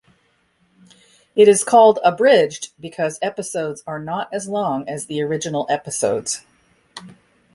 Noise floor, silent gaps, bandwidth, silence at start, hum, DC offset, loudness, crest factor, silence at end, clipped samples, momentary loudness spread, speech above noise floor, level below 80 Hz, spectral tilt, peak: -62 dBFS; none; 11.5 kHz; 1.35 s; none; under 0.1%; -18 LUFS; 18 dB; 0.45 s; under 0.1%; 16 LU; 44 dB; -64 dBFS; -3.5 dB/octave; -2 dBFS